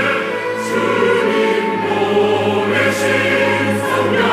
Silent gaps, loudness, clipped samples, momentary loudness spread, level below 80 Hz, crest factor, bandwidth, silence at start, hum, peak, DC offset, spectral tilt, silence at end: none; -15 LUFS; under 0.1%; 4 LU; -60 dBFS; 12 dB; 16 kHz; 0 s; none; -4 dBFS; under 0.1%; -4.5 dB/octave; 0 s